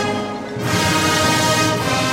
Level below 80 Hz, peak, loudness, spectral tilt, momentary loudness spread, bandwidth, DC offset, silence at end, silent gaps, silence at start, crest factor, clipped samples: -44 dBFS; -4 dBFS; -17 LUFS; -3.5 dB/octave; 9 LU; 16.5 kHz; under 0.1%; 0 s; none; 0 s; 14 dB; under 0.1%